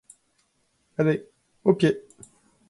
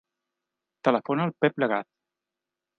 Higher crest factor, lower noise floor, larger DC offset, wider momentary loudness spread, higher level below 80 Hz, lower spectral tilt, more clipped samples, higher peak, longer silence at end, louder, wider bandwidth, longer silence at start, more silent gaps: about the same, 22 dB vs 24 dB; second, -70 dBFS vs -88 dBFS; neither; first, 12 LU vs 4 LU; first, -66 dBFS vs -78 dBFS; about the same, -7.5 dB/octave vs -8 dB/octave; neither; about the same, -6 dBFS vs -6 dBFS; second, 0.7 s vs 0.95 s; about the same, -25 LUFS vs -26 LUFS; first, 11.5 kHz vs 6.8 kHz; first, 1 s vs 0.85 s; neither